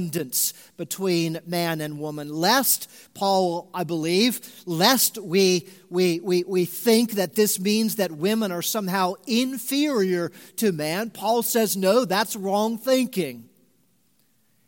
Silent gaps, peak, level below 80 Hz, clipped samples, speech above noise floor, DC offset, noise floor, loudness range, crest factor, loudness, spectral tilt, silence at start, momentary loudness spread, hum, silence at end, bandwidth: none; -4 dBFS; -74 dBFS; under 0.1%; 43 dB; under 0.1%; -66 dBFS; 3 LU; 20 dB; -23 LUFS; -3.5 dB/octave; 0 s; 9 LU; none; 1.25 s; 17 kHz